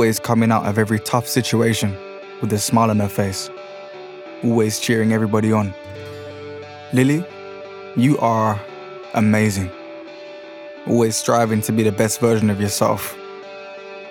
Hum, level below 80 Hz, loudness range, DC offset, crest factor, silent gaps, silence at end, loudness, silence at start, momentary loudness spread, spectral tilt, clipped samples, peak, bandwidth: none; -62 dBFS; 2 LU; under 0.1%; 16 dB; none; 0 s; -19 LUFS; 0 s; 18 LU; -5.5 dB/octave; under 0.1%; -4 dBFS; 19 kHz